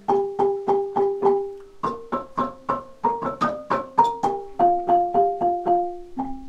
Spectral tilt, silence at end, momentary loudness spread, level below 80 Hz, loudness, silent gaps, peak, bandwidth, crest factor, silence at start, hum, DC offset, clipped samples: -7 dB/octave; 0 s; 9 LU; -52 dBFS; -23 LUFS; none; -4 dBFS; 8.6 kHz; 18 dB; 0.1 s; none; under 0.1%; under 0.1%